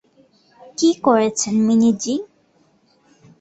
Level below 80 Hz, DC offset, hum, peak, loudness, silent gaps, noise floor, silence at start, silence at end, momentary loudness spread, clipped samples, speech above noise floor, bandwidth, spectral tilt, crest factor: -62 dBFS; under 0.1%; none; -2 dBFS; -18 LUFS; none; -59 dBFS; 0.8 s; 1.15 s; 10 LU; under 0.1%; 42 dB; 8.2 kHz; -4.5 dB/octave; 18 dB